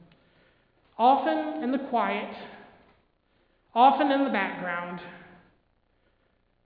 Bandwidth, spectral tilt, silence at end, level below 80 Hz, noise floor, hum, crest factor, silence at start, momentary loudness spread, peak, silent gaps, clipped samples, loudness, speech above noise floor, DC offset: 5 kHz; -8.5 dB/octave; 1.4 s; -70 dBFS; -69 dBFS; none; 20 dB; 1 s; 21 LU; -8 dBFS; none; under 0.1%; -25 LUFS; 44 dB; under 0.1%